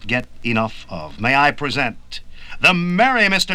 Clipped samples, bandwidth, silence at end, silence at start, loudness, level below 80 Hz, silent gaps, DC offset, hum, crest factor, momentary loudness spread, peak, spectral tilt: under 0.1%; 17 kHz; 0 s; 0 s; -17 LUFS; -40 dBFS; none; under 0.1%; none; 18 dB; 18 LU; 0 dBFS; -4.5 dB/octave